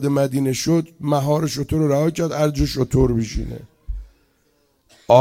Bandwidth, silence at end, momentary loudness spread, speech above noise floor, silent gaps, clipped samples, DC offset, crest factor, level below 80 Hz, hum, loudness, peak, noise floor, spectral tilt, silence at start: 16.5 kHz; 0 s; 18 LU; 43 dB; none; under 0.1%; under 0.1%; 18 dB; -34 dBFS; none; -20 LUFS; 0 dBFS; -63 dBFS; -6.5 dB/octave; 0 s